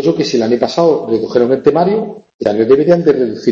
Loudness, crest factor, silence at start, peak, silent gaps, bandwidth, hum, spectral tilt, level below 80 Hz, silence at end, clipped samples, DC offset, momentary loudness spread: -13 LUFS; 12 dB; 0 s; 0 dBFS; 2.34-2.39 s; 7.6 kHz; none; -6.5 dB/octave; -50 dBFS; 0 s; under 0.1%; under 0.1%; 7 LU